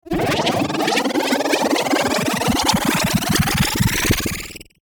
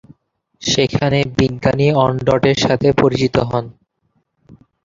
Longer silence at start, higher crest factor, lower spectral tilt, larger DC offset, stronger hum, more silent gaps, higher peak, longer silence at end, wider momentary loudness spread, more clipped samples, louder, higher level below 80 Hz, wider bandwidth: second, 0.05 s vs 0.6 s; about the same, 16 dB vs 16 dB; second, -4 dB/octave vs -5.5 dB/octave; neither; neither; neither; about the same, -4 dBFS vs -2 dBFS; about the same, 0.2 s vs 0.3 s; second, 3 LU vs 7 LU; neither; about the same, -18 LUFS vs -16 LUFS; about the same, -36 dBFS vs -40 dBFS; first, over 20 kHz vs 7.6 kHz